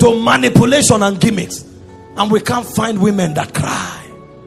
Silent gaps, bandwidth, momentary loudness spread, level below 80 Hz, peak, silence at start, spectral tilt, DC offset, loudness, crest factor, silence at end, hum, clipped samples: none; 16 kHz; 15 LU; -44 dBFS; 0 dBFS; 0 s; -4.5 dB/octave; under 0.1%; -13 LUFS; 14 dB; 0.05 s; none; 0.4%